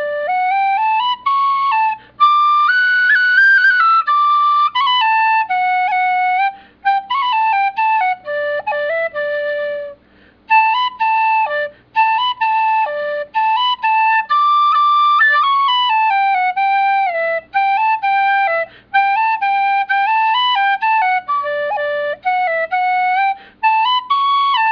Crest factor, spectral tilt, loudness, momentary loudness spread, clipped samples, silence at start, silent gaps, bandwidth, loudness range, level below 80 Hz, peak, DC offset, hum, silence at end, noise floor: 12 dB; -1.5 dB/octave; -14 LUFS; 8 LU; under 0.1%; 0 s; none; 5.4 kHz; 5 LU; -62 dBFS; -2 dBFS; under 0.1%; 60 Hz at -60 dBFS; 0 s; -49 dBFS